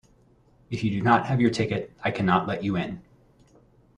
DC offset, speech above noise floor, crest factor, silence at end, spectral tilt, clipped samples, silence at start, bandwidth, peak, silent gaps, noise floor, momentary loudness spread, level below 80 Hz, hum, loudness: under 0.1%; 35 dB; 20 dB; 0.95 s; -7 dB/octave; under 0.1%; 0.7 s; 10 kHz; -6 dBFS; none; -59 dBFS; 11 LU; -56 dBFS; none; -25 LUFS